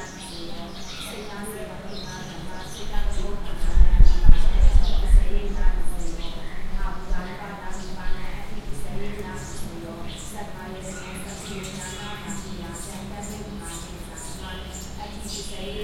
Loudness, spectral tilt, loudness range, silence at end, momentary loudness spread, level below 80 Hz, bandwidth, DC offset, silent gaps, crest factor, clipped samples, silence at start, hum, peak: -30 LUFS; -4.5 dB/octave; 11 LU; 0 s; 14 LU; -22 dBFS; 12.5 kHz; under 0.1%; none; 20 dB; under 0.1%; 0 s; none; 0 dBFS